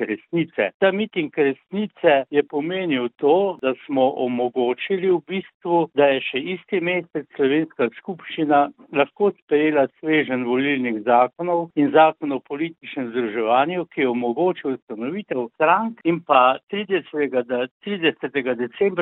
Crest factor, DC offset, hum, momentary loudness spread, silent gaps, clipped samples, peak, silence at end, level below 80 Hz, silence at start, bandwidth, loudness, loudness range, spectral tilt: 20 dB; under 0.1%; none; 9 LU; 0.74-0.80 s, 5.54-5.60 s, 9.42-9.47 s, 14.82-14.87 s, 16.63-16.67 s, 17.71-17.80 s; under 0.1%; 0 dBFS; 0 s; -70 dBFS; 0 s; 4.1 kHz; -21 LUFS; 2 LU; -10 dB/octave